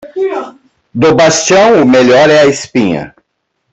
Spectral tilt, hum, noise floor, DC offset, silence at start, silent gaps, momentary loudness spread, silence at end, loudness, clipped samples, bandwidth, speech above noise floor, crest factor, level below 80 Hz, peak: -4 dB/octave; none; -66 dBFS; under 0.1%; 0.05 s; none; 16 LU; 0.65 s; -8 LUFS; under 0.1%; 8.4 kHz; 59 dB; 10 dB; -46 dBFS; 0 dBFS